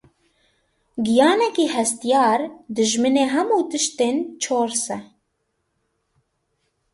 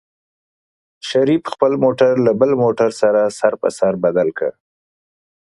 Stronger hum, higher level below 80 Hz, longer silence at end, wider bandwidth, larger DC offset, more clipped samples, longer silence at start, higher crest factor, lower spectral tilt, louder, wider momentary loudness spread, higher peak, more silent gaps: neither; second, -66 dBFS vs -60 dBFS; first, 1.9 s vs 1.1 s; about the same, 11.5 kHz vs 11.5 kHz; neither; neither; about the same, 0.95 s vs 1.05 s; about the same, 18 dB vs 16 dB; second, -2.5 dB/octave vs -6 dB/octave; second, -20 LUFS vs -16 LUFS; first, 9 LU vs 6 LU; second, -4 dBFS vs 0 dBFS; neither